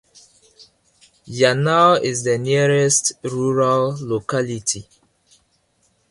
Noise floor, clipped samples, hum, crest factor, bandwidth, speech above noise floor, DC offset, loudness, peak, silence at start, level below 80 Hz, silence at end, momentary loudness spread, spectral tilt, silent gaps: -63 dBFS; under 0.1%; none; 20 dB; 11.5 kHz; 46 dB; under 0.1%; -18 LUFS; -2 dBFS; 1.25 s; -58 dBFS; 1.3 s; 9 LU; -4 dB/octave; none